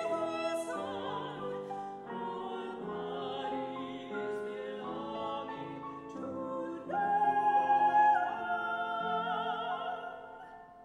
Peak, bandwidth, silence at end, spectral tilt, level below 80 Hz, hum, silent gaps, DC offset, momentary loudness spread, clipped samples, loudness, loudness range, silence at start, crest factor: -18 dBFS; 12 kHz; 0 s; -5 dB/octave; -74 dBFS; none; none; under 0.1%; 14 LU; under 0.1%; -34 LUFS; 9 LU; 0 s; 16 dB